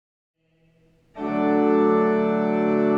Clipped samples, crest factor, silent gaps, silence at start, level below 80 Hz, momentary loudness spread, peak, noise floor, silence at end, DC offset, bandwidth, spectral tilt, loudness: under 0.1%; 14 dB; none; 1.15 s; -62 dBFS; 7 LU; -8 dBFS; -62 dBFS; 0 s; under 0.1%; 5.6 kHz; -9 dB/octave; -21 LUFS